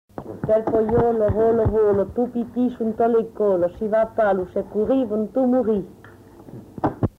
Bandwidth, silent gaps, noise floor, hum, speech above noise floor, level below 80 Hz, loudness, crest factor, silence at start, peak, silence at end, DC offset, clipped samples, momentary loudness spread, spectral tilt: 5.2 kHz; none; -45 dBFS; none; 25 dB; -42 dBFS; -21 LUFS; 14 dB; 0.2 s; -6 dBFS; 0.1 s; under 0.1%; under 0.1%; 8 LU; -10 dB/octave